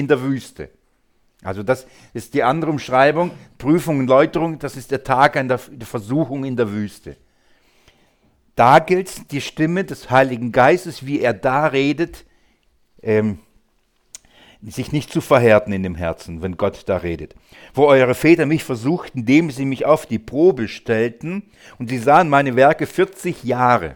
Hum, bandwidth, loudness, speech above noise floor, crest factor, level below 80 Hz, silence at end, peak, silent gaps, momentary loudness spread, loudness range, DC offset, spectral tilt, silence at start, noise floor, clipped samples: none; 19 kHz; -18 LUFS; 44 dB; 18 dB; -48 dBFS; 0 s; 0 dBFS; none; 15 LU; 5 LU; under 0.1%; -6.5 dB/octave; 0 s; -62 dBFS; under 0.1%